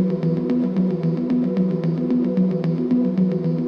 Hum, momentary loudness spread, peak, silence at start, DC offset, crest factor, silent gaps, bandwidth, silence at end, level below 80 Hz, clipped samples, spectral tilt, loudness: none; 2 LU; -10 dBFS; 0 s; under 0.1%; 10 dB; none; 5.4 kHz; 0 s; -62 dBFS; under 0.1%; -11 dB/octave; -21 LUFS